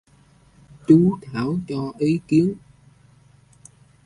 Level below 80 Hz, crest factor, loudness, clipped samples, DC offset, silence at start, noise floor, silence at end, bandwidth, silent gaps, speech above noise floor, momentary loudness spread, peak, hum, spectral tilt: -54 dBFS; 20 dB; -20 LUFS; under 0.1%; under 0.1%; 0.9 s; -55 dBFS; 1.5 s; 11 kHz; none; 35 dB; 13 LU; -2 dBFS; none; -8.5 dB/octave